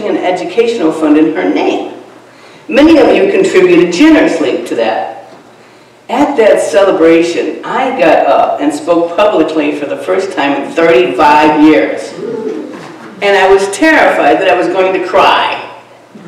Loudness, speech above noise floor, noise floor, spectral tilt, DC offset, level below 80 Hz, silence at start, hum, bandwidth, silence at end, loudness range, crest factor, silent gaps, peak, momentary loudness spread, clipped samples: -9 LUFS; 31 dB; -39 dBFS; -4.5 dB/octave; under 0.1%; -46 dBFS; 0 s; none; 12.5 kHz; 0 s; 2 LU; 10 dB; none; 0 dBFS; 12 LU; 3%